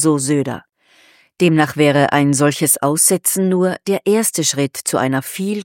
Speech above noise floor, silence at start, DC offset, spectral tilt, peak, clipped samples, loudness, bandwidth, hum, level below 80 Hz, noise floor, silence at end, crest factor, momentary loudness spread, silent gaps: 36 dB; 0 s; under 0.1%; -4 dB/octave; 0 dBFS; under 0.1%; -15 LUFS; 17 kHz; none; -64 dBFS; -51 dBFS; 0 s; 16 dB; 7 LU; none